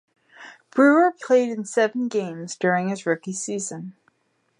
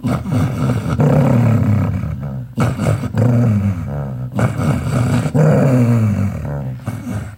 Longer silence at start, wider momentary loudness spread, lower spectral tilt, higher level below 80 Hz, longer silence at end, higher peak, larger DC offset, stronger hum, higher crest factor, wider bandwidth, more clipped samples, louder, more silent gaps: first, 0.4 s vs 0 s; first, 14 LU vs 11 LU; second, -5 dB/octave vs -8.5 dB/octave; second, -78 dBFS vs -34 dBFS; first, 0.7 s vs 0 s; second, -6 dBFS vs 0 dBFS; neither; neither; about the same, 18 dB vs 16 dB; second, 11 kHz vs 16 kHz; neither; second, -22 LUFS vs -16 LUFS; neither